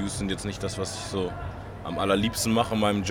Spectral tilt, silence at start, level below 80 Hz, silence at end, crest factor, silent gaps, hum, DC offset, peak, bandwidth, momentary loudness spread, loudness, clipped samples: -4.5 dB/octave; 0 s; -44 dBFS; 0 s; 18 dB; none; none; under 0.1%; -8 dBFS; 19 kHz; 11 LU; -27 LUFS; under 0.1%